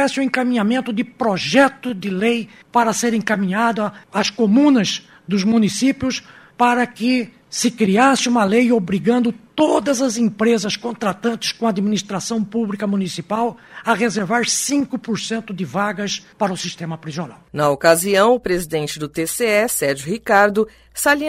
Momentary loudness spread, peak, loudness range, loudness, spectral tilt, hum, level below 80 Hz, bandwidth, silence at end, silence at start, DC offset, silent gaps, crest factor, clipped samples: 10 LU; 0 dBFS; 4 LU; -18 LUFS; -4 dB/octave; none; -54 dBFS; 16 kHz; 0 s; 0 s; under 0.1%; none; 18 dB; under 0.1%